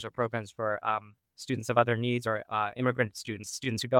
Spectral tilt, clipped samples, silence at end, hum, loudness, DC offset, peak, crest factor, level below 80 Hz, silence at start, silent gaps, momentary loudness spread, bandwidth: -5 dB/octave; under 0.1%; 0 s; none; -31 LUFS; under 0.1%; -6 dBFS; 24 dB; -70 dBFS; 0 s; none; 9 LU; 17 kHz